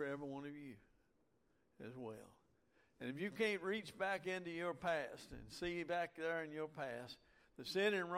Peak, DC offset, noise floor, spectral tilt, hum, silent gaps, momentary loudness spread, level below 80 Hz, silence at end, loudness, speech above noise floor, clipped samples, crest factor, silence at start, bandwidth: -26 dBFS; under 0.1%; -80 dBFS; -5 dB/octave; none; none; 16 LU; -72 dBFS; 0 s; -44 LUFS; 36 dB; under 0.1%; 18 dB; 0 s; 16 kHz